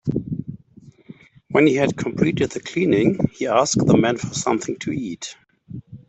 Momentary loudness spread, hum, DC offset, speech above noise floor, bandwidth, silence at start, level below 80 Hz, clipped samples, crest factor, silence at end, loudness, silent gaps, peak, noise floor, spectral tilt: 17 LU; none; under 0.1%; 29 dB; 8.4 kHz; 0.05 s; -52 dBFS; under 0.1%; 18 dB; 0.1 s; -20 LUFS; none; -4 dBFS; -48 dBFS; -5.5 dB/octave